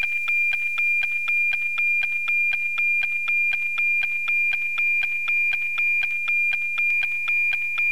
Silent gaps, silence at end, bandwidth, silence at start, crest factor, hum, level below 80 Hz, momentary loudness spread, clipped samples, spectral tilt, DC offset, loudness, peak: none; 0 s; over 20 kHz; 0 s; 6 dB; none; -72 dBFS; 1 LU; under 0.1%; 0.5 dB/octave; 2%; -20 LUFS; -16 dBFS